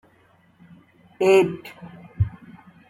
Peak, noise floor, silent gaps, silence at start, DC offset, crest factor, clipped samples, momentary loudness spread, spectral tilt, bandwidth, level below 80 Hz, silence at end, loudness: -4 dBFS; -58 dBFS; none; 1.2 s; under 0.1%; 20 dB; under 0.1%; 25 LU; -6.5 dB/octave; 14 kHz; -48 dBFS; 0.6 s; -21 LUFS